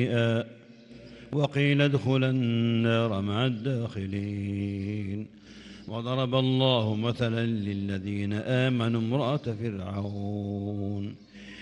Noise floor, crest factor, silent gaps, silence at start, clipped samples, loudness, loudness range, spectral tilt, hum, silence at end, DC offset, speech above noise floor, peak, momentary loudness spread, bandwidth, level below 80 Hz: -49 dBFS; 18 dB; none; 0 s; under 0.1%; -28 LUFS; 4 LU; -7.5 dB/octave; none; 0 s; under 0.1%; 21 dB; -10 dBFS; 14 LU; 9.6 kHz; -64 dBFS